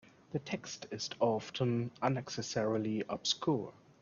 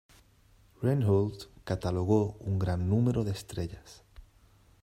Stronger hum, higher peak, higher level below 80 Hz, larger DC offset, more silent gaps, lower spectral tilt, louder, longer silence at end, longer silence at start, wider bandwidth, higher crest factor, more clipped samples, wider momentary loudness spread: neither; about the same, -14 dBFS vs -12 dBFS; second, -72 dBFS vs -54 dBFS; neither; neither; second, -5 dB/octave vs -8 dB/octave; second, -36 LUFS vs -30 LUFS; second, 0.3 s vs 0.6 s; second, 0.3 s vs 0.8 s; second, 7.4 kHz vs 14 kHz; about the same, 22 dB vs 18 dB; neither; second, 8 LU vs 11 LU